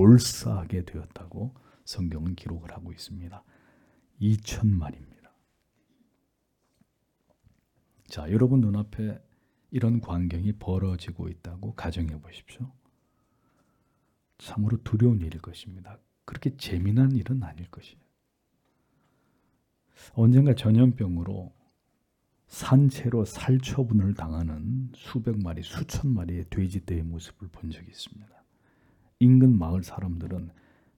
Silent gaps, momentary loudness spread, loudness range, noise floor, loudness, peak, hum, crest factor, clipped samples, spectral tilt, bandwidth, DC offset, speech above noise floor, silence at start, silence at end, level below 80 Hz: none; 21 LU; 10 LU; -75 dBFS; -26 LUFS; -4 dBFS; none; 22 dB; under 0.1%; -7.5 dB/octave; 14.5 kHz; under 0.1%; 49 dB; 0 s; 0.45 s; -50 dBFS